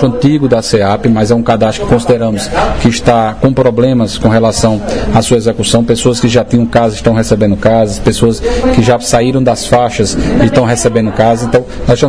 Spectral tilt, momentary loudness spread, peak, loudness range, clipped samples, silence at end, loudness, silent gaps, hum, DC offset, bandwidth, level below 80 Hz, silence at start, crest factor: -5.5 dB/octave; 3 LU; 0 dBFS; 0 LU; 1%; 0 s; -10 LUFS; none; none; 3%; 11 kHz; -26 dBFS; 0 s; 10 dB